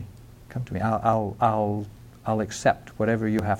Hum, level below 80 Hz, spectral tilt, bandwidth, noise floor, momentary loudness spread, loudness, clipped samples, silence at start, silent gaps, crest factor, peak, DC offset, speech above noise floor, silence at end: none; -50 dBFS; -6.5 dB/octave; 16 kHz; -45 dBFS; 13 LU; -25 LUFS; under 0.1%; 0 s; none; 18 dB; -8 dBFS; under 0.1%; 21 dB; 0 s